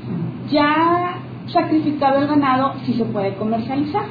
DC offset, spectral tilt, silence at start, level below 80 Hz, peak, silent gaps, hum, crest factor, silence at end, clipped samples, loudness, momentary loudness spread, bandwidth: under 0.1%; -9 dB/octave; 0 s; -56 dBFS; -6 dBFS; none; none; 14 dB; 0 s; under 0.1%; -19 LUFS; 8 LU; 5 kHz